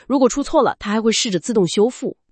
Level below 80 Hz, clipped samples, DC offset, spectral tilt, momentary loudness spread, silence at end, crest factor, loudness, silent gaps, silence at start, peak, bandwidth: -46 dBFS; under 0.1%; under 0.1%; -4 dB/octave; 3 LU; 0.2 s; 16 dB; -18 LUFS; none; 0.1 s; -2 dBFS; 8.8 kHz